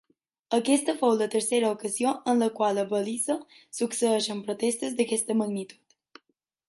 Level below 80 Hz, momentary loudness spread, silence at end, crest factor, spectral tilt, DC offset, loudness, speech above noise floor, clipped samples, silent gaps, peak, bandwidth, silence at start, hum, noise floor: -78 dBFS; 7 LU; 0.95 s; 16 dB; -3.5 dB/octave; under 0.1%; -27 LUFS; 49 dB; under 0.1%; none; -10 dBFS; 12 kHz; 0.5 s; none; -75 dBFS